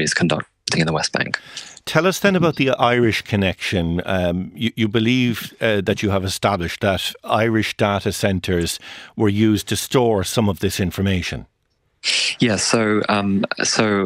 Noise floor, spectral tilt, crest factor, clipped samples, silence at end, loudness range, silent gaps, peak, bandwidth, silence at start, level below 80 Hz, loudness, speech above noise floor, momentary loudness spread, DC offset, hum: -67 dBFS; -4.5 dB/octave; 20 dB; under 0.1%; 0 s; 1 LU; none; 0 dBFS; 16 kHz; 0 s; -46 dBFS; -19 LUFS; 48 dB; 6 LU; under 0.1%; none